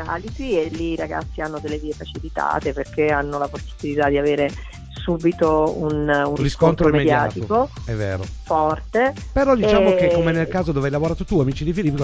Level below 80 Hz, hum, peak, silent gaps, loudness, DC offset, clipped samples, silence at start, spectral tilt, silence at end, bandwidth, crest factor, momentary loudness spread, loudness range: -34 dBFS; none; 0 dBFS; none; -20 LUFS; under 0.1%; under 0.1%; 0 s; -7 dB/octave; 0 s; 8 kHz; 18 dB; 12 LU; 5 LU